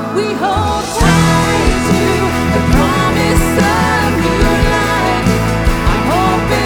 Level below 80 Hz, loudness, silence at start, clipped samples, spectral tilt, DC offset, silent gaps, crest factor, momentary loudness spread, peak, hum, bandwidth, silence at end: -20 dBFS; -12 LUFS; 0 s; under 0.1%; -5 dB/octave; under 0.1%; none; 12 dB; 3 LU; 0 dBFS; none; 20 kHz; 0 s